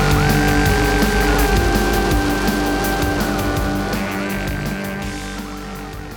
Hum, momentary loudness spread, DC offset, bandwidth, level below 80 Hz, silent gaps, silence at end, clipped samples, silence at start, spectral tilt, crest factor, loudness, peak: none; 12 LU; under 0.1%; 20 kHz; -24 dBFS; none; 0 s; under 0.1%; 0 s; -5 dB/octave; 16 dB; -18 LUFS; -2 dBFS